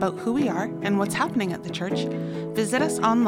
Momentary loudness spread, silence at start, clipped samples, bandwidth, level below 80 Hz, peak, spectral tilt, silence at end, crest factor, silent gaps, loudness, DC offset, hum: 6 LU; 0 s; under 0.1%; 16.5 kHz; -60 dBFS; -8 dBFS; -5.5 dB/octave; 0 s; 18 dB; none; -25 LUFS; under 0.1%; none